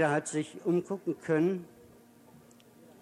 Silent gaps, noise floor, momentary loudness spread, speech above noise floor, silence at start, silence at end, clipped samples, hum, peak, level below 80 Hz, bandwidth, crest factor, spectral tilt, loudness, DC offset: none; -57 dBFS; 9 LU; 27 dB; 0 s; 1.35 s; under 0.1%; none; -14 dBFS; -78 dBFS; 14 kHz; 18 dB; -6 dB/octave; -31 LUFS; under 0.1%